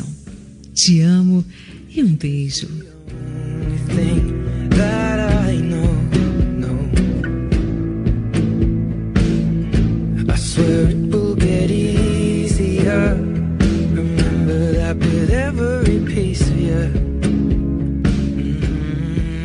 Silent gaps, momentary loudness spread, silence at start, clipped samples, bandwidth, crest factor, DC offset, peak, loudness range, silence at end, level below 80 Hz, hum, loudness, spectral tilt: none; 7 LU; 0 s; under 0.1%; 11 kHz; 16 dB; under 0.1%; 0 dBFS; 2 LU; 0 s; -24 dBFS; none; -18 LUFS; -6.5 dB/octave